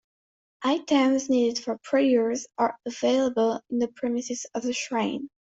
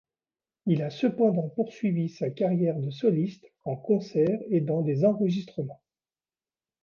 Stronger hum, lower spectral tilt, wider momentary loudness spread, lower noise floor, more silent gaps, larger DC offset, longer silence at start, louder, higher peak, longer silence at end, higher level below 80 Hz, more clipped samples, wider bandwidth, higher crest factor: neither; second, -3.5 dB/octave vs -9 dB/octave; second, 8 LU vs 11 LU; about the same, under -90 dBFS vs under -90 dBFS; neither; neither; about the same, 0.6 s vs 0.65 s; about the same, -26 LUFS vs -27 LUFS; about the same, -10 dBFS vs -10 dBFS; second, 0.3 s vs 1.1 s; about the same, -70 dBFS vs -72 dBFS; neither; first, 8 kHz vs 7 kHz; about the same, 16 dB vs 16 dB